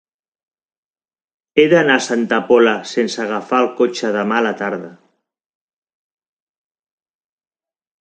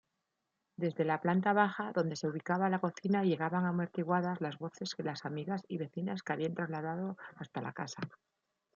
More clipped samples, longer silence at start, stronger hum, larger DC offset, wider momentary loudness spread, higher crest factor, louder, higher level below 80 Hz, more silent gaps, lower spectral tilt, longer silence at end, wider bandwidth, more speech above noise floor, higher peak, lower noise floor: neither; first, 1.55 s vs 0.8 s; neither; neither; about the same, 9 LU vs 11 LU; about the same, 18 dB vs 22 dB; first, -16 LUFS vs -35 LUFS; first, -68 dBFS vs -82 dBFS; neither; second, -4.5 dB/octave vs -6.5 dB/octave; first, 3.05 s vs 0.6 s; first, 9.2 kHz vs 7.4 kHz; about the same, 51 dB vs 51 dB; first, 0 dBFS vs -14 dBFS; second, -66 dBFS vs -86 dBFS